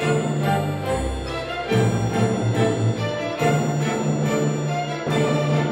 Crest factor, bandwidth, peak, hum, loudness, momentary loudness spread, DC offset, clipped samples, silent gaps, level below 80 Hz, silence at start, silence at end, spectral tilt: 14 dB; 14 kHz; -8 dBFS; none; -22 LUFS; 5 LU; under 0.1%; under 0.1%; none; -40 dBFS; 0 s; 0 s; -6 dB/octave